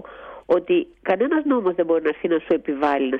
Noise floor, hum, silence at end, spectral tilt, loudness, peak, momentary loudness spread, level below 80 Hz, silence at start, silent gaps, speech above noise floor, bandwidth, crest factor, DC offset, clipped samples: -39 dBFS; none; 0 s; -7.5 dB/octave; -21 LUFS; -8 dBFS; 4 LU; -58 dBFS; 0.05 s; none; 19 dB; 5.4 kHz; 14 dB; under 0.1%; under 0.1%